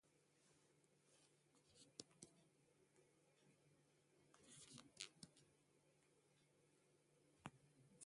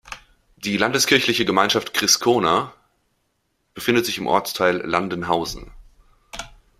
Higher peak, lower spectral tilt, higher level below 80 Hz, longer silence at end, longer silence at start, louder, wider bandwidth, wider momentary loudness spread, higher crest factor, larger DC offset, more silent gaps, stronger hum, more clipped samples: second, -30 dBFS vs 0 dBFS; about the same, -2.5 dB/octave vs -2.5 dB/octave; second, under -90 dBFS vs -50 dBFS; second, 0 s vs 0.3 s; about the same, 0.05 s vs 0.05 s; second, -62 LUFS vs -19 LUFS; second, 11.5 kHz vs 16 kHz; second, 9 LU vs 20 LU; first, 40 dB vs 22 dB; neither; neither; neither; neither